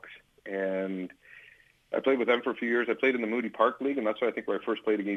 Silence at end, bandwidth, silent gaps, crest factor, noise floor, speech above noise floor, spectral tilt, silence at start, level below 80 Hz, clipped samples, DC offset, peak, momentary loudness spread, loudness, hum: 0 s; 6.6 kHz; none; 20 dB; -58 dBFS; 30 dB; -6.5 dB/octave; 0.05 s; -76 dBFS; under 0.1%; under 0.1%; -10 dBFS; 11 LU; -29 LUFS; none